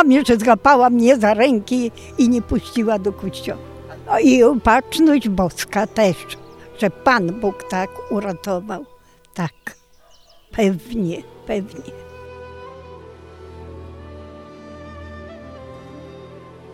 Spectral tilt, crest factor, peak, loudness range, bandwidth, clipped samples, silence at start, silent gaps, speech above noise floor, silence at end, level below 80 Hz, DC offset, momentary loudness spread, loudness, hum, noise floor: -5.5 dB/octave; 18 dB; 0 dBFS; 21 LU; 14.5 kHz; under 0.1%; 0 s; none; 33 dB; 0.3 s; -44 dBFS; under 0.1%; 25 LU; -18 LUFS; none; -50 dBFS